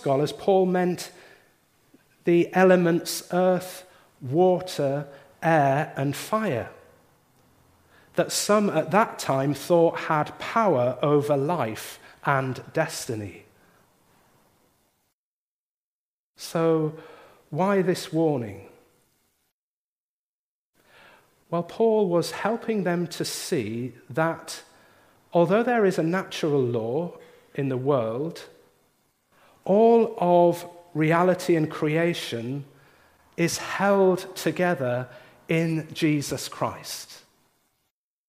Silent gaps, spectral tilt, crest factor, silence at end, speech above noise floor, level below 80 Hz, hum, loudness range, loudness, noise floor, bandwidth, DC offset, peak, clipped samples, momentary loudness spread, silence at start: 15.13-16.35 s, 19.52-20.73 s; -5.5 dB/octave; 20 dB; 1.1 s; over 67 dB; -70 dBFS; none; 8 LU; -24 LUFS; under -90 dBFS; 15.5 kHz; under 0.1%; -4 dBFS; under 0.1%; 14 LU; 0 s